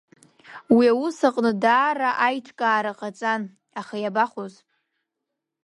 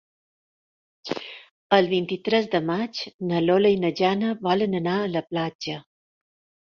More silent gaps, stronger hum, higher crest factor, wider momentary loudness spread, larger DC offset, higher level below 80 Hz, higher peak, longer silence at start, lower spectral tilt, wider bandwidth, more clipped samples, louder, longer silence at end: second, none vs 1.51-1.70 s, 3.14-3.19 s, 5.55-5.59 s; neither; about the same, 18 dB vs 22 dB; about the same, 15 LU vs 13 LU; neither; about the same, -70 dBFS vs -66 dBFS; about the same, -6 dBFS vs -4 dBFS; second, 0.5 s vs 1.05 s; about the same, -5.5 dB/octave vs -6.5 dB/octave; first, 11 kHz vs 7 kHz; neither; about the same, -22 LUFS vs -24 LUFS; first, 1.15 s vs 0.85 s